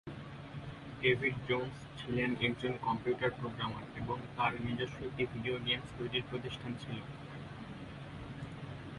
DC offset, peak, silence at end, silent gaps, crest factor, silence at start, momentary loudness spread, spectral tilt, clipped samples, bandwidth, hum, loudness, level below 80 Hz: under 0.1%; -16 dBFS; 0 s; none; 22 dB; 0.05 s; 14 LU; -6.5 dB/octave; under 0.1%; 11.5 kHz; none; -38 LUFS; -58 dBFS